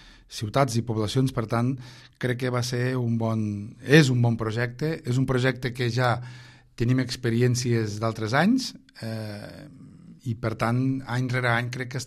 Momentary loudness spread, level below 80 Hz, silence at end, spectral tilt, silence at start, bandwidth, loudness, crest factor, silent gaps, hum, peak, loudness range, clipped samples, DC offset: 13 LU; -52 dBFS; 0 s; -6 dB/octave; 0.05 s; 13 kHz; -25 LUFS; 22 dB; none; none; -2 dBFS; 4 LU; under 0.1%; under 0.1%